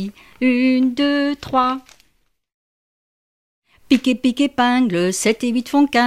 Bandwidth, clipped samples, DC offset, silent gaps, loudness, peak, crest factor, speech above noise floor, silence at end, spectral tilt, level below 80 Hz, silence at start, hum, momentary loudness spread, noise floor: 14.5 kHz; under 0.1%; 0.2%; 2.54-3.62 s; -18 LUFS; -2 dBFS; 18 dB; 47 dB; 0 s; -4 dB/octave; -56 dBFS; 0 s; none; 5 LU; -65 dBFS